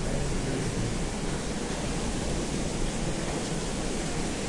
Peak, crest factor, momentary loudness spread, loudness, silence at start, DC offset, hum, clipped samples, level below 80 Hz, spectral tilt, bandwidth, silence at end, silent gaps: -16 dBFS; 12 dB; 2 LU; -31 LUFS; 0 s; under 0.1%; none; under 0.1%; -36 dBFS; -4.5 dB/octave; 11.5 kHz; 0 s; none